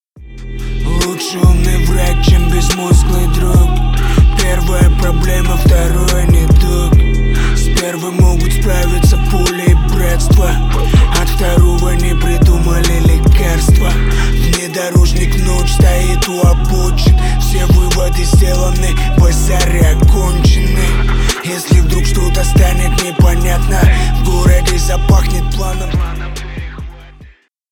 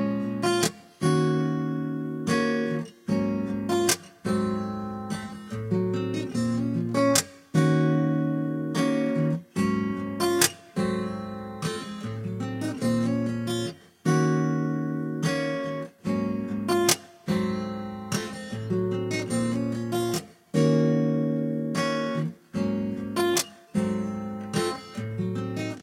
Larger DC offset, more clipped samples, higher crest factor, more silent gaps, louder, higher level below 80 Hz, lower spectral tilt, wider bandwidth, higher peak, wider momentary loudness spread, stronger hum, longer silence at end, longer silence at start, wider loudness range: neither; neither; second, 10 dB vs 22 dB; neither; first, -12 LUFS vs -27 LUFS; first, -12 dBFS vs -60 dBFS; about the same, -5.5 dB/octave vs -5 dB/octave; about the same, 17.5 kHz vs 16.5 kHz; first, 0 dBFS vs -4 dBFS; second, 5 LU vs 10 LU; neither; first, 0.45 s vs 0 s; first, 0.15 s vs 0 s; second, 1 LU vs 4 LU